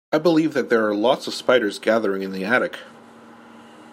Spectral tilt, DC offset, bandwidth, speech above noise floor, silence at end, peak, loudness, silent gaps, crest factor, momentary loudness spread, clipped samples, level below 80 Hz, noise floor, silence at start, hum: -5 dB/octave; under 0.1%; 15.5 kHz; 25 dB; 0.1 s; -2 dBFS; -20 LUFS; none; 18 dB; 7 LU; under 0.1%; -72 dBFS; -45 dBFS; 0.1 s; none